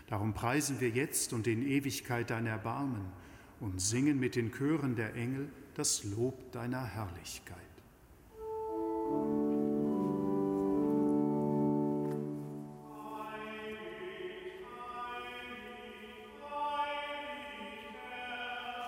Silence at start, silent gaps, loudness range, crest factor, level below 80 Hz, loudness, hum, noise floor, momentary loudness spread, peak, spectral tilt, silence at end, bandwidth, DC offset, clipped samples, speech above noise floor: 0 s; none; 10 LU; 18 dB; -64 dBFS; -36 LUFS; none; -59 dBFS; 14 LU; -18 dBFS; -5 dB/octave; 0 s; 16.5 kHz; under 0.1%; under 0.1%; 24 dB